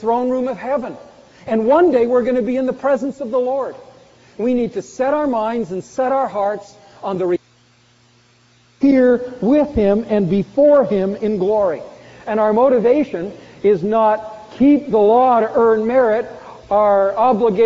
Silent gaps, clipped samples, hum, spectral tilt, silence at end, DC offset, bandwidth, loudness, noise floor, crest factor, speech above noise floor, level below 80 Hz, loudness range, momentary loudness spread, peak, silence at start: none; under 0.1%; none; -6.5 dB/octave; 0 s; under 0.1%; 7.6 kHz; -16 LUFS; -53 dBFS; 14 dB; 38 dB; -48 dBFS; 6 LU; 11 LU; -4 dBFS; 0 s